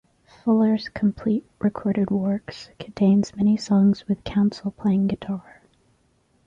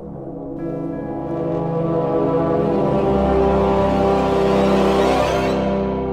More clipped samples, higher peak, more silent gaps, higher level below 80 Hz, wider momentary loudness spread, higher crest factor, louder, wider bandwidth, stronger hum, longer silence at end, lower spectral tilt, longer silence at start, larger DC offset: neither; second, -10 dBFS vs -4 dBFS; neither; second, -54 dBFS vs -34 dBFS; about the same, 10 LU vs 10 LU; about the same, 12 dB vs 14 dB; second, -23 LUFS vs -18 LUFS; second, 7.6 kHz vs 14 kHz; neither; first, 1.05 s vs 0 s; about the same, -8 dB/octave vs -7.5 dB/octave; first, 0.45 s vs 0 s; neither